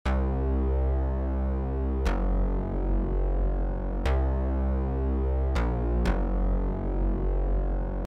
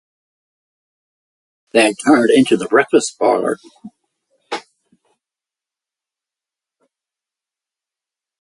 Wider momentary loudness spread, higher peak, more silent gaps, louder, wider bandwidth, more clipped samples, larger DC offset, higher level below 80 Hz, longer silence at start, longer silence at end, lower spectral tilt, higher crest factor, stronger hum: second, 3 LU vs 17 LU; second, -12 dBFS vs 0 dBFS; neither; second, -29 LUFS vs -14 LUFS; second, 6 kHz vs 11.5 kHz; neither; neither; first, -26 dBFS vs -64 dBFS; second, 0.05 s vs 1.75 s; second, 0 s vs 3.8 s; first, -8.5 dB/octave vs -4 dB/octave; second, 12 dB vs 20 dB; neither